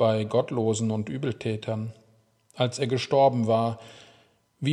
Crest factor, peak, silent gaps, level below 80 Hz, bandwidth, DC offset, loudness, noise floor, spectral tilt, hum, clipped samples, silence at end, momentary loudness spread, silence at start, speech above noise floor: 18 dB; -8 dBFS; none; -70 dBFS; 11 kHz; under 0.1%; -26 LUFS; -62 dBFS; -6 dB/octave; none; under 0.1%; 0 s; 11 LU; 0 s; 37 dB